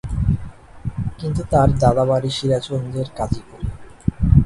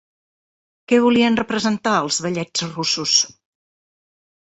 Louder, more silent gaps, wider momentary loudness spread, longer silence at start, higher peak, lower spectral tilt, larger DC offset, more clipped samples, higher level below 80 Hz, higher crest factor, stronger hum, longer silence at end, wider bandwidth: about the same, -20 LUFS vs -18 LUFS; neither; first, 15 LU vs 7 LU; second, 0.05 s vs 0.9 s; about the same, 0 dBFS vs -2 dBFS; first, -7.5 dB/octave vs -3 dB/octave; neither; neither; first, -28 dBFS vs -60 dBFS; about the same, 18 dB vs 20 dB; neither; second, 0 s vs 1.3 s; first, 11.5 kHz vs 8.2 kHz